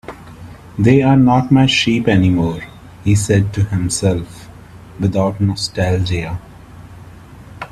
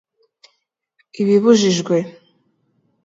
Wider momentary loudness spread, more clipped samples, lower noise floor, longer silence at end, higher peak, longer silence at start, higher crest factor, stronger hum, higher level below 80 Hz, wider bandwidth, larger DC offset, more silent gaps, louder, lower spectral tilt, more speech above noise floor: first, 20 LU vs 10 LU; neither; second, -37 dBFS vs -70 dBFS; second, 0.05 s vs 0.95 s; about the same, 0 dBFS vs -2 dBFS; second, 0.1 s vs 1.2 s; about the same, 16 dB vs 18 dB; neither; first, -40 dBFS vs -66 dBFS; first, 13.5 kHz vs 7.8 kHz; neither; neither; about the same, -15 LUFS vs -16 LUFS; about the same, -6 dB/octave vs -5.5 dB/octave; second, 23 dB vs 55 dB